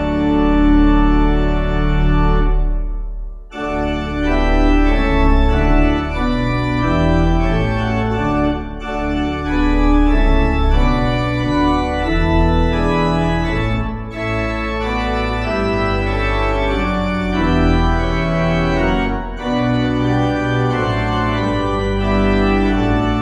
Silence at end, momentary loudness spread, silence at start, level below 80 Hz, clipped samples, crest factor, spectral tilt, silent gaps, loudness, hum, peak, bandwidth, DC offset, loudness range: 0 s; 6 LU; 0 s; -20 dBFS; under 0.1%; 14 dB; -7.5 dB/octave; none; -17 LUFS; none; -2 dBFS; 8 kHz; under 0.1%; 2 LU